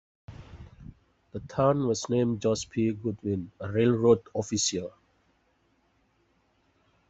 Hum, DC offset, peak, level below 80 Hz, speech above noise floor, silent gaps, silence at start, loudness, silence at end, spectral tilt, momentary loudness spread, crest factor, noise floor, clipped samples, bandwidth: none; under 0.1%; -8 dBFS; -58 dBFS; 42 dB; none; 0.3 s; -27 LUFS; 2.2 s; -5.5 dB/octave; 24 LU; 20 dB; -69 dBFS; under 0.1%; 8.2 kHz